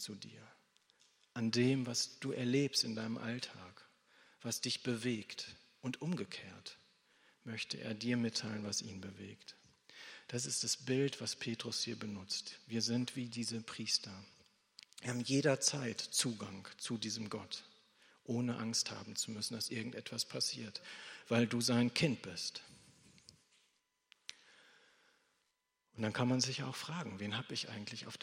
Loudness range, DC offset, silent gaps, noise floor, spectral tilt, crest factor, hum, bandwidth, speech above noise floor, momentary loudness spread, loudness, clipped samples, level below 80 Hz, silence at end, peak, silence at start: 5 LU; under 0.1%; none; -84 dBFS; -3.5 dB/octave; 24 dB; none; 16 kHz; 45 dB; 18 LU; -38 LUFS; under 0.1%; -82 dBFS; 0.05 s; -16 dBFS; 0 s